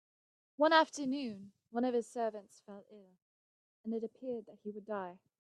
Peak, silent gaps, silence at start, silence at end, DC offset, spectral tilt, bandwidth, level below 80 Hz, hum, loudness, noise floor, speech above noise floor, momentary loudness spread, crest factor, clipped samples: -12 dBFS; 3.22-3.84 s; 0.6 s; 0.25 s; under 0.1%; -4 dB/octave; 11.5 kHz; -88 dBFS; none; -35 LUFS; under -90 dBFS; over 54 dB; 23 LU; 26 dB; under 0.1%